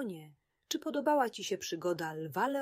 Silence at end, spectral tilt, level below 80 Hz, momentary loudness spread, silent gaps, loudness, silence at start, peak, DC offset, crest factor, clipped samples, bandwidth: 0 s; -4 dB/octave; -80 dBFS; 9 LU; none; -35 LUFS; 0 s; -16 dBFS; under 0.1%; 18 dB; under 0.1%; 16 kHz